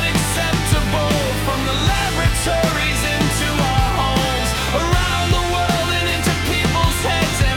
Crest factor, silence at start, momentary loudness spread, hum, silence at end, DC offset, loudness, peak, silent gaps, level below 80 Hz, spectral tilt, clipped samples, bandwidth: 14 dB; 0 s; 1 LU; none; 0 s; under 0.1%; -18 LUFS; -4 dBFS; none; -26 dBFS; -4 dB/octave; under 0.1%; 18 kHz